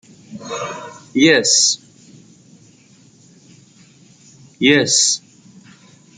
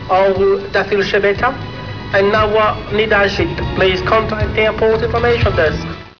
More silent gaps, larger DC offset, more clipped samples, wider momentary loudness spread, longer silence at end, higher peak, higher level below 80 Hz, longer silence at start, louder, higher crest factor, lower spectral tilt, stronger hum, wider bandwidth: neither; second, under 0.1% vs 0.7%; neither; first, 19 LU vs 6 LU; first, 1 s vs 0.05 s; about the same, 0 dBFS vs -2 dBFS; second, -64 dBFS vs -30 dBFS; first, 0.3 s vs 0 s; about the same, -14 LUFS vs -14 LUFS; first, 20 dB vs 14 dB; second, -2 dB/octave vs -6.5 dB/octave; neither; first, 10.5 kHz vs 5.4 kHz